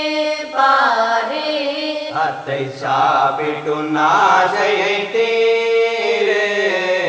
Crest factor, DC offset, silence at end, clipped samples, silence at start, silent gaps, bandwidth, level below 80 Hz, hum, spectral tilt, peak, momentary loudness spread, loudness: 14 dB; under 0.1%; 0 s; under 0.1%; 0 s; none; 8 kHz; -66 dBFS; none; -3.5 dB/octave; -2 dBFS; 8 LU; -16 LUFS